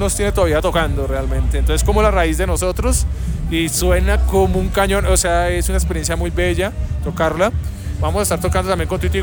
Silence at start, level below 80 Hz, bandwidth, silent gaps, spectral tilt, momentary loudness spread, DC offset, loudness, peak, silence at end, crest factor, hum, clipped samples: 0 s; -20 dBFS; 19.5 kHz; none; -5 dB/octave; 6 LU; under 0.1%; -17 LUFS; -4 dBFS; 0 s; 12 dB; none; under 0.1%